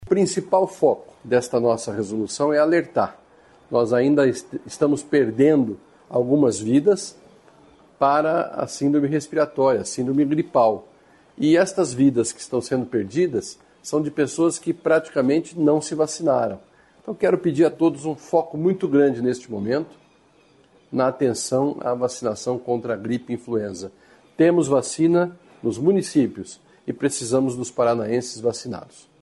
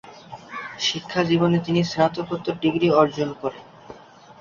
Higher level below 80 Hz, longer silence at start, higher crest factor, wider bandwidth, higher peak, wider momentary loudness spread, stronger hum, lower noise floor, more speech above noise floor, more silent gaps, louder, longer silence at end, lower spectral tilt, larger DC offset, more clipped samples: about the same, -62 dBFS vs -58 dBFS; about the same, 0 s vs 0.05 s; about the same, 16 dB vs 20 dB; first, 11.5 kHz vs 7.4 kHz; about the same, -4 dBFS vs -2 dBFS; second, 10 LU vs 16 LU; neither; first, -56 dBFS vs -44 dBFS; first, 36 dB vs 23 dB; neither; about the same, -21 LUFS vs -22 LUFS; about the same, 0.4 s vs 0.4 s; about the same, -5.5 dB/octave vs -5.5 dB/octave; neither; neither